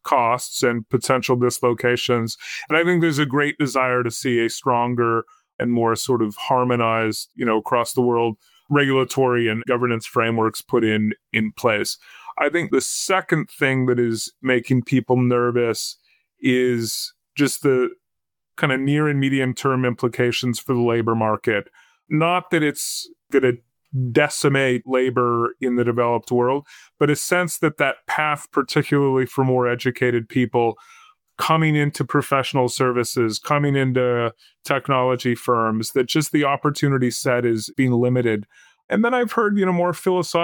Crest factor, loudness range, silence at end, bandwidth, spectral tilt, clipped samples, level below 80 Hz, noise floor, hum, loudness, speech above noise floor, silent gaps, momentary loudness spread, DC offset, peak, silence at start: 16 dB; 1 LU; 0 s; 18 kHz; -5 dB/octave; under 0.1%; -64 dBFS; -85 dBFS; none; -20 LUFS; 65 dB; 5.54-5.59 s, 38.84-38.88 s; 5 LU; under 0.1%; -4 dBFS; 0.05 s